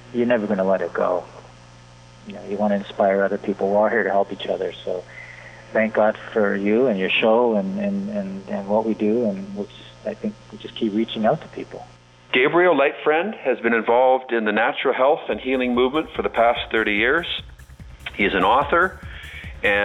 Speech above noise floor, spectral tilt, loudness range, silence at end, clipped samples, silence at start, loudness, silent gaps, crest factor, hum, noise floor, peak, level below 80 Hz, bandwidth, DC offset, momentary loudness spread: 25 dB; -6.5 dB/octave; 5 LU; 0 s; under 0.1%; 0.05 s; -21 LUFS; none; 16 dB; none; -46 dBFS; -6 dBFS; -48 dBFS; 9.8 kHz; under 0.1%; 17 LU